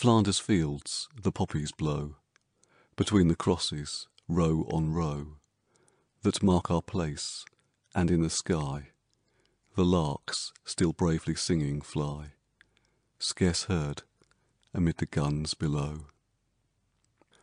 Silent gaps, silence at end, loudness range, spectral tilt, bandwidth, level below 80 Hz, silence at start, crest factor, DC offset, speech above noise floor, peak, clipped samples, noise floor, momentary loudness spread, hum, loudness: none; 1.35 s; 3 LU; -5.5 dB/octave; 10 kHz; -48 dBFS; 0 s; 20 dB; under 0.1%; 47 dB; -10 dBFS; under 0.1%; -75 dBFS; 12 LU; none; -30 LUFS